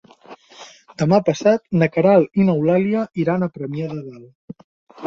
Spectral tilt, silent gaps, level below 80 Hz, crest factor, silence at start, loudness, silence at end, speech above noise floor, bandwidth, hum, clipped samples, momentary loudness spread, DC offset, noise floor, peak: -7.5 dB/octave; 4.35-4.48 s, 4.64-4.87 s; -58 dBFS; 18 dB; 0.3 s; -18 LUFS; 0 s; 26 dB; 7.4 kHz; none; under 0.1%; 16 LU; under 0.1%; -44 dBFS; -2 dBFS